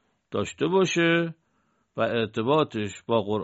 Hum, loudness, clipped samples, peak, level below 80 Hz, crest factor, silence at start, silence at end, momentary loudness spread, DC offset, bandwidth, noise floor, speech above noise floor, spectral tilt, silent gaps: none; -25 LUFS; under 0.1%; -10 dBFS; -66 dBFS; 16 dB; 0.3 s; 0 s; 11 LU; under 0.1%; 8 kHz; -70 dBFS; 46 dB; -4 dB/octave; none